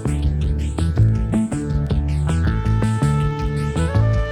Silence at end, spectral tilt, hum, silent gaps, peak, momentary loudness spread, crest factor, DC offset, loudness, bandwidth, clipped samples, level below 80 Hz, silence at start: 0 s; -7.5 dB/octave; none; none; -4 dBFS; 4 LU; 14 dB; under 0.1%; -20 LUFS; 11 kHz; under 0.1%; -24 dBFS; 0 s